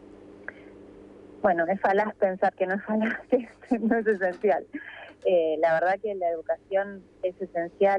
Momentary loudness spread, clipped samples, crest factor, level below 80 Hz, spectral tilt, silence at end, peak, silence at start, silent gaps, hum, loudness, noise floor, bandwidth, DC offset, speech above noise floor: 13 LU; under 0.1%; 16 dB; -64 dBFS; -7.5 dB/octave; 0 s; -12 dBFS; 0.15 s; none; none; -26 LUFS; -48 dBFS; 8.6 kHz; under 0.1%; 22 dB